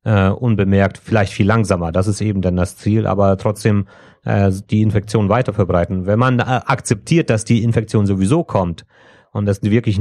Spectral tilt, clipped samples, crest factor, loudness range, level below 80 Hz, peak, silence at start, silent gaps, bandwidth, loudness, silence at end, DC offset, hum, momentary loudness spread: -7 dB/octave; under 0.1%; 14 dB; 1 LU; -42 dBFS; -2 dBFS; 0.05 s; none; 12 kHz; -16 LUFS; 0 s; under 0.1%; none; 5 LU